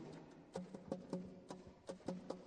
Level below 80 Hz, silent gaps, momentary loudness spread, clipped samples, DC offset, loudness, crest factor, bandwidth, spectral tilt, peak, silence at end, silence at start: -76 dBFS; none; 8 LU; under 0.1%; under 0.1%; -51 LUFS; 22 dB; 10.5 kHz; -6.5 dB/octave; -30 dBFS; 0 s; 0 s